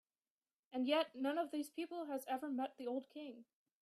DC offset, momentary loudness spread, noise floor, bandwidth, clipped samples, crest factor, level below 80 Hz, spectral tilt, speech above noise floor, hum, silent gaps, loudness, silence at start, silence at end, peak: under 0.1%; 15 LU; under -90 dBFS; 15 kHz; under 0.1%; 20 dB; under -90 dBFS; -3 dB/octave; over 48 dB; none; none; -42 LUFS; 0.7 s; 0.4 s; -24 dBFS